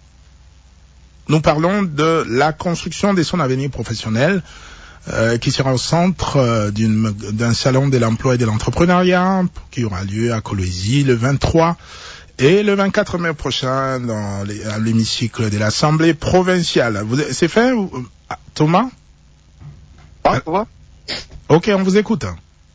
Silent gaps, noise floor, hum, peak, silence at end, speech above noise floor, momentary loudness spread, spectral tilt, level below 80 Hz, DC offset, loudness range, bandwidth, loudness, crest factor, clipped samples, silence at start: none; -48 dBFS; none; -2 dBFS; 0.35 s; 32 dB; 11 LU; -6 dB/octave; -38 dBFS; under 0.1%; 3 LU; 8 kHz; -17 LUFS; 16 dB; under 0.1%; 1.3 s